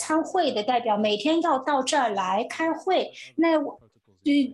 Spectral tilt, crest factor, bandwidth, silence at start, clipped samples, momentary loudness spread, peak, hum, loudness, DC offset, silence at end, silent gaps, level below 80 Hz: -3.5 dB/octave; 14 dB; 12 kHz; 0 s; under 0.1%; 4 LU; -10 dBFS; none; -24 LUFS; under 0.1%; 0 s; none; -70 dBFS